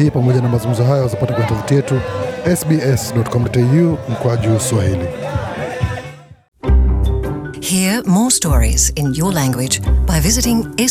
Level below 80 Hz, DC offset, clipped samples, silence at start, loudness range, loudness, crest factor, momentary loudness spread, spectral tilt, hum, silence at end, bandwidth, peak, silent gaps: -22 dBFS; under 0.1%; under 0.1%; 0 s; 4 LU; -16 LUFS; 14 dB; 9 LU; -5 dB/octave; none; 0 s; 16 kHz; -2 dBFS; 6.48-6.52 s